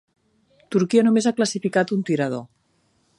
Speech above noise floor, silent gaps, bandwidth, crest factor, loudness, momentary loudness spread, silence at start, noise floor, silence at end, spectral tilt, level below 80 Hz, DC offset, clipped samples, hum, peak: 45 dB; none; 11.5 kHz; 18 dB; -21 LUFS; 8 LU; 0.7 s; -65 dBFS; 0.75 s; -5.5 dB/octave; -70 dBFS; under 0.1%; under 0.1%; none; -6 dBFS